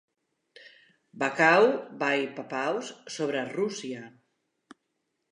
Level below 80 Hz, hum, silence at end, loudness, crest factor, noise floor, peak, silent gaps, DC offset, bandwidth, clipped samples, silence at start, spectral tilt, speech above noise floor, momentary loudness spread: -86 dBFS; none; 1.2 s; -27 LUFS; 24 dB; -79 dBFS; -6 dBFS; none; under 0.1%; 10.5 kHz; under 0.1%; 0.6 s; -4 dB/octave; 52 dB; 17 LU